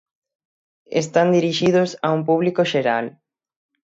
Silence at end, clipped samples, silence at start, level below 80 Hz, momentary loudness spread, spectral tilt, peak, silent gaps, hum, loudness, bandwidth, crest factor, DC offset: 0.8 s; under 0.1%; 0.9 s; -64 dBFS; 7 LU; -5.5 dB/octave; -4 dBFS; none; none; -19 LUFS; 8 kHz; 16 dB; under 0.1%